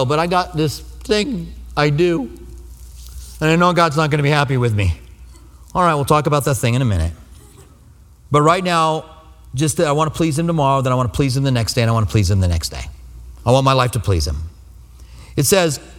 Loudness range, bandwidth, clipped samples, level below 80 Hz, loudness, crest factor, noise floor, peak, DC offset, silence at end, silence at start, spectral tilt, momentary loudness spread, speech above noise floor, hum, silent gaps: 3 LU; 17 kHz; under 0.1%; -34 dBFS; -17 LUFS; 18 dB; -45 dBFS; 0 dBFS; under 0.1%; 0 s; 0 s; -5.5 dB/octave; 13 LU; 29 dB; none; none